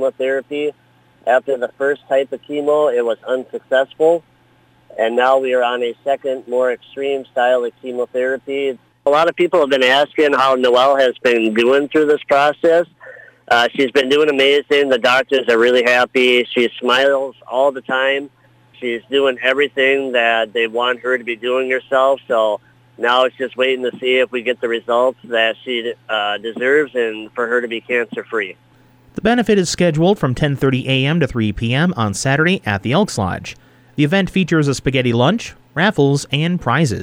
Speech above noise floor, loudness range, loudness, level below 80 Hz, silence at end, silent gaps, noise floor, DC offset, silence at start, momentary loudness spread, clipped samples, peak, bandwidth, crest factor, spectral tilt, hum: 37 dB; 5 LU; -16 LUFS; -48 dBFS; 0 s; none; -53 dBFS; under 0.1%; 0 s; 9 LU; under 0.1%; -2 dBFS; 16.5 kHz; 14 dB; -5 dB/octave; none